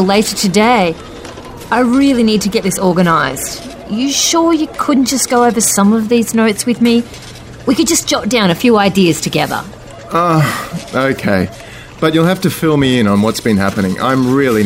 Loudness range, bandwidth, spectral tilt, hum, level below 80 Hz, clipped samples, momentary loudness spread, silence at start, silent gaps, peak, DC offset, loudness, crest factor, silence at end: 2 LU; 16.5 kHz; -4.5 dB/octave; none; -40 dBFS; under 0.1%; 12 LU; 0 s; none; 0 dBFS; under 0.1%; -12 LUFS; 12 dB; 0 s